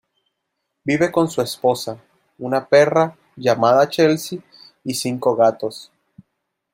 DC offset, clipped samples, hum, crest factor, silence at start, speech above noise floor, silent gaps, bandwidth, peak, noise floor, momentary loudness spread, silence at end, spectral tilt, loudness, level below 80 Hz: under 0.1%; under 0.1%; none; 16 dB; 0.85 s; 59 dB; none; 16 kHz; -2 dBFS; -76 dBFS; 16 LU; 0.9 s; -5 dB/octave; -18 LUFS; -64 dBFS